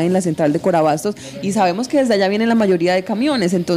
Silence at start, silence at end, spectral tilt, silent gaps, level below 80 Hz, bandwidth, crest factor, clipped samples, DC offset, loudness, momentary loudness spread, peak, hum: 0 s; 0 s; -5.5 dB/octave; none; -56 dBFS; 15.5 kHz; 12 dB; under 0.1%; under 0.1%; -17 LUFS; 6 LU; -4 dBFS; none